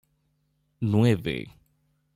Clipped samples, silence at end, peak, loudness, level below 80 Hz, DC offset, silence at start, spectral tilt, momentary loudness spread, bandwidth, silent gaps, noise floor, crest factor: under 0.1%; 0.65 s; -10 dBFS; -25 LUFS; -58 dBFS; under 0.1%; 0.8 s; -7.5 dB/octave; 14 LU; 14.5 kHz; none; -72 dBFS; 18 dB